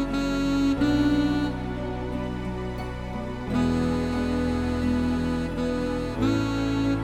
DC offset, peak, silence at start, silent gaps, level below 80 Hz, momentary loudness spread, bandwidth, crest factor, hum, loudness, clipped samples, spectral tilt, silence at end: under 0.1%; -12 dBFS; 0 s; none; -38 dBFS; 9 LU; 14 kHz; 12 dB; none; -26 LUFS; under 0.1%; -7 dB/octave; 0 s